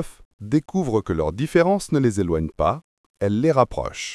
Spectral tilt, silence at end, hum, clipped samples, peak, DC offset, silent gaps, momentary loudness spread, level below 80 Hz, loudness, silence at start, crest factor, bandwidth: -6.5 dB/octave; 0 s; none; under 0.1%; -2 dBFS; under 0.1%; 0.25-0.39 s, 2.84-3.14 s; 9 LU; -42 dBFS; -22 LUFS; 0 s; 18 dB; 12 kHz